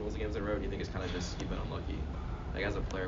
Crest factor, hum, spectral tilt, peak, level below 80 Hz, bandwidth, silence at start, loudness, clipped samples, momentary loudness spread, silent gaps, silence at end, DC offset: 16 dB; none; -5.5 dB/octave; -20 dBFS; -40 dBFS; 7.4 kHz; 0 s; -38 LUFS; under 0.1%; 4 LU; none; 0 s; under 0.1%